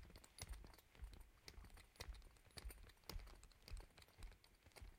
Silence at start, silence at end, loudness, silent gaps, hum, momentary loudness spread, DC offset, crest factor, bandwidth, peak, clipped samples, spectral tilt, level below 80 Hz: 0 s; 0 s; -61 LUFS; none; none; 8 LU; under 0.1%; 24 dB; 16.5 kHz; -34 dBFS; under 0.1%; -3.5 dB/octave; -60 dBFS